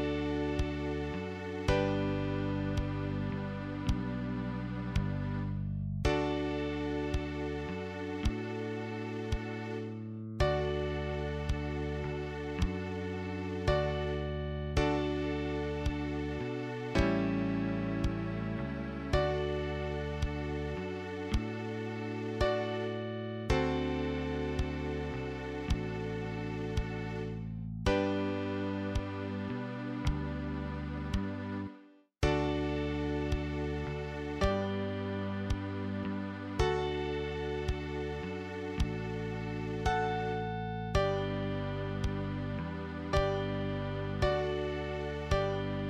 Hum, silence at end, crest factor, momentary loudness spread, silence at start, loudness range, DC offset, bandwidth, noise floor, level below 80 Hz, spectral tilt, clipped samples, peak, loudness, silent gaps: none; 0 s; 20 dB; 7 LU; 0 s; 2 LU; under 0.1%; 11 kHz; -57 dBFS; -42 dBFS; -7 dB/octave; under 0.1%; -14 dBFS; -35 LUFS; none